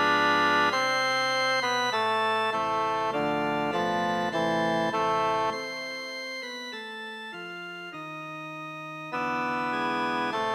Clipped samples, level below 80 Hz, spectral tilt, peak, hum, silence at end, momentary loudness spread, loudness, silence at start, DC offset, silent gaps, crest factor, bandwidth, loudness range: under 0.1%; -64 dBFS; -3.5 dB/octave; -12 dBFS; none; 0 s; 14 LU; -27 LUFS; 0 s; under 0.1%; none; 16 dB; 16 kHz; 11 LU